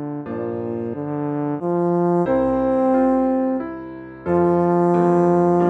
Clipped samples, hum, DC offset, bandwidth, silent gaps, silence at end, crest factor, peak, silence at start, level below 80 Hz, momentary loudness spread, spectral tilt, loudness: under 0.1%; none; under 0.1%; 4 kHz; none; 0 s; 12 dB; -6 dBFS; 0 s; -50 dBFS; 11 LU; -10.5 dB/octave; -19 LUFS